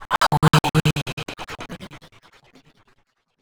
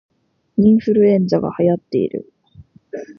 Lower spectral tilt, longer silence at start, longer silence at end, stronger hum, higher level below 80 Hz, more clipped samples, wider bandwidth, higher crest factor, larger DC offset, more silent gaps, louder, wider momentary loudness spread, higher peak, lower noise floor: second, -5 dB/octave vs -9.5 dB/octave; second, 0 s vs 0.6 s; first, 1.45 s vs 0.05 s; neither; first, -44 dBFS vs -52 dBFS; neither; first, over 20 kHz vs 6.2 kHz; first, 22 dB vs 14 dB; neither; first, 1.02-1.06 s, 1.13-1.17 s vs none; second, -20 LUFS vs -16 LUFS; first, 20 LU vs 17 LU; about the same, -2 dBFS vs -2 dBFS; first, -65 dBFS vs -46 dBFS